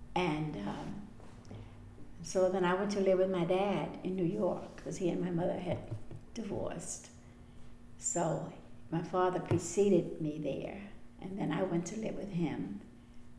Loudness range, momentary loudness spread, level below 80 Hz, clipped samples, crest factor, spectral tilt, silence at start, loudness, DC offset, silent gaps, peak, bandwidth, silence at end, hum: 6 LU; 19 LU; -56 dBFS; under 0.1%; 18 dB; -5.5 dB/octave; 0 s; -35 LUFS; under 0.1%; none; -18 dBFS; 11 kHz; 0 s; none